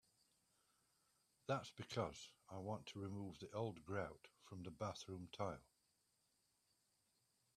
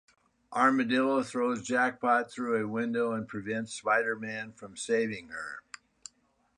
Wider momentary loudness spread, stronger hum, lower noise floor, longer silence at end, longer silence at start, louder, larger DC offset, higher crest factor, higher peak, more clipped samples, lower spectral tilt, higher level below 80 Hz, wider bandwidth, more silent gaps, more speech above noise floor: second, 11 LU vs 17 LU; neither; first, -84 dBFS vs -70 dBFS; first, 1.95 s vs 1 s; first, 1.5 s vs 0.5 s; second, -50 LUFS vs -30 LUFS; neither; about the same, 24 dB vs 20 dB; second, -28 dBFS vs -12 dBFS; neither; about the same, -5.5 dB/octave vs -4.5 dB/octave; second, -78 dBFS vs -72 dBFS; first, 13.5 kHz vs 11 kHz; neither; second, 34 dB vs 40 dB